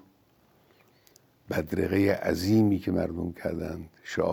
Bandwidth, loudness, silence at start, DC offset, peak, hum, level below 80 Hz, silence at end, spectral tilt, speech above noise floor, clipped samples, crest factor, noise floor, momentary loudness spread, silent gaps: over 20 kHz; -28 LUFS; 1.5 s; under 0.1%; -10 dBFS; none; -58 dBFS; 0 s; -7 dB/octave; 37 dB; under 0.1%; 18 dB; -63 dBFS; 12 LU; none